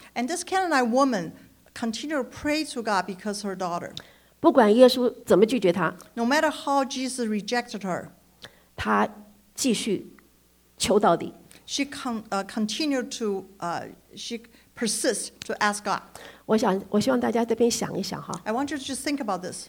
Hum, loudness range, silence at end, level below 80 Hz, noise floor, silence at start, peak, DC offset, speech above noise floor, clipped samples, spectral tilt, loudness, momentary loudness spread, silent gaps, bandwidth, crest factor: none; 8 LU; 0 s; -60 dBFS; -60 dBFS; 0 s; -4 dBFS; under 0.1%; 35 dB; under 0.1%; -4 dB/octave; -25 LUFS; 12 LU; none; over 20 kHz; 22 dB